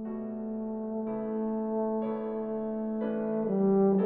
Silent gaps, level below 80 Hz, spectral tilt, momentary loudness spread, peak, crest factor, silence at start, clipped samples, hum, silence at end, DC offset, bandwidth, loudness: none; -64 dBFS; -10.5 dB/octave; 9 LU; -16 dBFS; 14 dB; 0 s; under 0.1%; none; 0 s; under 0.1%; 3.6 kHz; -31 LUFS